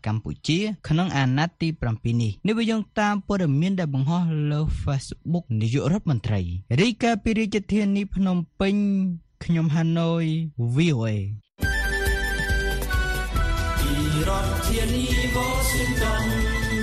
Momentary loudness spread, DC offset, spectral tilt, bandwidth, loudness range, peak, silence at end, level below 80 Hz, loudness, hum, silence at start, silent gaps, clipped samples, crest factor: 5 LU; under 0.1%; -5.5 dB/octave; 14.5 kHz; 1 LU; -8 dBFS; 0 s; -32 dBFS; -24 LUFS; none; 0.05 s; none; under 0.1%; 16 dB